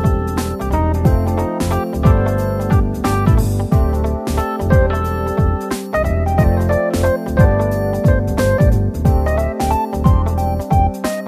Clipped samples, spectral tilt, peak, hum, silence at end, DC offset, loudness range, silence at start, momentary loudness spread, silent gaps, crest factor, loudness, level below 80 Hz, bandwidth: under 0.1%; -7.5 dB/octave; 0 dBFS; none; 0 s; under 0.1%; 1 LU; 0 s; 5 LU; none; 14 dB; -16 LUFS; -20 dBFS; 14 kHz